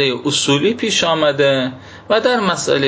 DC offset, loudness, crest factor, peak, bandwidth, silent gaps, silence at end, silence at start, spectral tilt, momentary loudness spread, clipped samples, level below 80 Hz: under 0.1%; -15 LUFS; 14 dB; -2 dBFS; 8 kHz; none; 0 s; 0 s; -3.5 dB/octave; 4 LU; under 0.1%; -54 dBFS